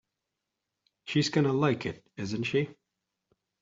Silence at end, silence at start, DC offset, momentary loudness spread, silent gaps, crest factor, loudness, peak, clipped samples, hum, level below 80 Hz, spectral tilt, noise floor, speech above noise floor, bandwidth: 0.9 s; 1.05 s; under 0.1%; 12 LU; none; 20 dB; -29 LUFS; -12 dBFS; under 0.1%; none; -68 dBFS; -6 dB/octave; -86 dBFS; 57 dB; 7.8 kHz